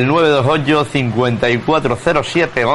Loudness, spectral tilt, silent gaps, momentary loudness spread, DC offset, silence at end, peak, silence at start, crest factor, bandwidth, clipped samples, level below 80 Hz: -14 LUFS; -6 dB/octave; none; 4 LU; under 0.1%; 0 s; -2 dBFS; 0 s; 12 dB; 11.5 kHz; under 0.1%; -42 dBFS